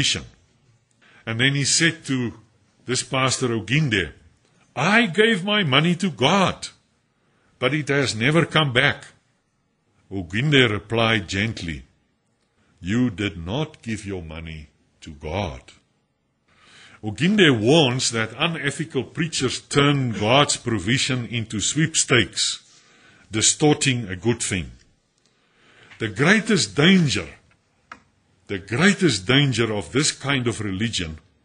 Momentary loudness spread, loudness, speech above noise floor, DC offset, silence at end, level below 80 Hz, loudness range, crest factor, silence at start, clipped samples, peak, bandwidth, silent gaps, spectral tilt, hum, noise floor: 16 LU; -20 LUFS; 48 dB; under 0.1%; 0.25 s; -50 dBFS; 8 LU; 20 dB; 0 s; under 0.1%; -2 dBFS; 10.5 kHz; none; -4 dB/octave; none; -69 dBFS